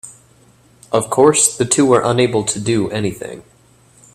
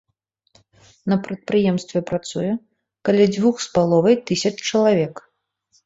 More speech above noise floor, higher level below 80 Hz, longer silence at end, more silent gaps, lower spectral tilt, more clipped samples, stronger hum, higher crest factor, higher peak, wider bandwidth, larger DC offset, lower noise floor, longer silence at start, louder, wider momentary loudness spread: second, 35 dB vs 52 dB; first, -52 dBFS vs -58 dBFS; about the same, 0.75 s vs 0.65 s; neither; second, -4 dB/octave vs -5.5 dB/octave; neither; neither; about the same, 18 dB vs 18 dB; first, 0 dBFS vs -4 dBFS; first, 15.5 kHz vs 8 kHz; neither; second, -50 dBFS vs -71 dBFS; second, 0.05 s vs 1.05 s; first, -15 LUFS vs -20 LUFS; about the same, 11 LU vs 9 LU